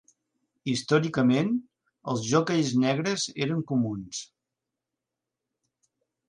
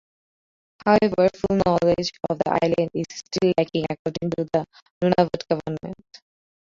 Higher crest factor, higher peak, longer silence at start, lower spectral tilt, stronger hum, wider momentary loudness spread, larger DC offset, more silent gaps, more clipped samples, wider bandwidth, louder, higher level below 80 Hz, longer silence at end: about the same, 20 dB vs 20 dB; second, -10 dBFS vs -4 dBFS; second, 0.65 s vs 0.85 s; second, -5 dB/octave vs -6.5 dB/octave; neither; about the same, 12 LU vs 11 LU; neither; second, none vs 3.99-4.05 s, 4.82-5.01 s; neither; first, 10.5 kHz vs 7.6 kHz; second, -26 LUFS vs -23 LUFS; second, -66 dBFS vs -52 dBFS; first, 2.05 s vs 0.8 s